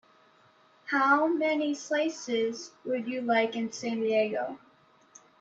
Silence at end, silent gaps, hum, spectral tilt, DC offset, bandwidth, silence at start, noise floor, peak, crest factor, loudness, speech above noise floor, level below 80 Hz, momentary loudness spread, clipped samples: 0.85 s; none; none; -3.5 dB/octave; under 0.1%; 8 kHz; 0.85 s; -62 dBFS; -12 dBFS; 18 dB; -29 LUFS; 33 dB; -82 dBFS; 11 LU; under 0.1%